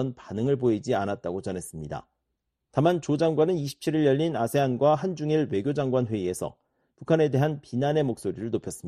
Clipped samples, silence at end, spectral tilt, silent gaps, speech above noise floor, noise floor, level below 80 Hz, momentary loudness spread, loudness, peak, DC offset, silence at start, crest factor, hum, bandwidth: under 0.1%; 0 s; -7 dB/octave; none; 55 dB; -81 dBFS; -60 dBFS; 11 LU; -26 LUFS; -8 dBFS; under 0.1%; 0 s; 18 dB; none; 13.5 kHz